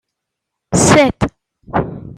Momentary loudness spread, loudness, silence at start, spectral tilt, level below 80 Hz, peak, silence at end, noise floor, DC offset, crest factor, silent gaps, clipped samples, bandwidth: 12 LU; -14 LUFS; 0.7 s; -4.5 dB/octave; -36 dBFS; 0 dBFS; 0 s; -78 dBFS; under 0.1%; 16 dB; none; under 0.1%; 16 kHz